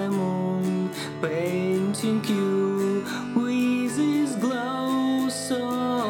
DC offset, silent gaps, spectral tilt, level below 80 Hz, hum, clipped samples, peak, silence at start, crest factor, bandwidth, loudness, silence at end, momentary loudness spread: under 0.1%; none; -5.5 dB/octave; -70 dBFS; none; under 0.1%; -10 dBFS; 0 s; 14 dB; 17.5 kHz; -25 LUFS; 0 s; 4 LU